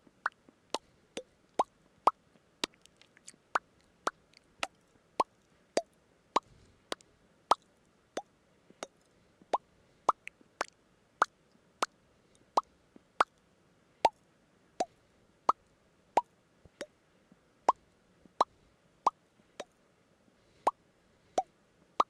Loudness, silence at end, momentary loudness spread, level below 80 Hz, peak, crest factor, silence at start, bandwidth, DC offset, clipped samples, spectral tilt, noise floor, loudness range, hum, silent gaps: -36 LUFS; 0.05 s; 17 LU; -74 dBFS; -8 dBFS; 30 dB; 0.25 s; 15 kHz; under 0.1%; under 0.1%; -2 dB/octave; -68 dBFS; 3 LU; none; none